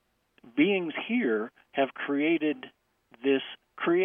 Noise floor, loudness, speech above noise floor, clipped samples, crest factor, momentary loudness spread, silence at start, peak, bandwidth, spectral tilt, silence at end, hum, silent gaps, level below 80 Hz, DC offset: -58 dBFS; -29 LUFS; 31 dB; under 0.1%; 18 dB; 10 LU; 0.45 s; -10 dBFS; 3.7 kHz; -8 dB/octave; 0 s; none; none; -78 dBFS; under 0.1%